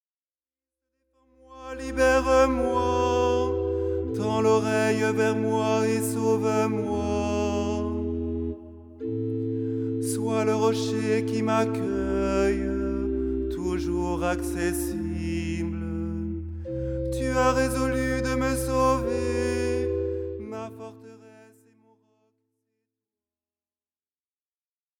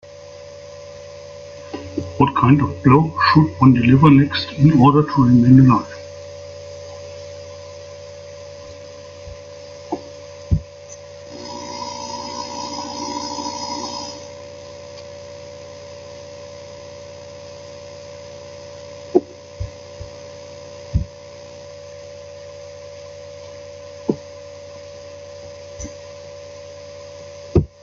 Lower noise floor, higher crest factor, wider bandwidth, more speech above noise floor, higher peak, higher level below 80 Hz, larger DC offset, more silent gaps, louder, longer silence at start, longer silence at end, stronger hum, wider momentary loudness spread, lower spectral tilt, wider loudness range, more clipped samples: first, under -90 dBFS vs -38 dBFS; about the same, 18 dB vs 20 dB; first, 18 kHz vs 7.4 kHz; first, over 66 dB vs 26 dB; second, -8 dBFS vs 0 dBFS; about the same, -40 dBFS vs -42 dBFS; neither; neither; second, -26 LUFS vs -17 LUFS; first, 1.5 s vs 0.2 s; first, 3.55 s vs 0.15 s; neither; second, 10 LU vs 24 LU; about the same, -6 dB/octave vs -7 dB/octave; second, 5 LU vs 22 LU; neither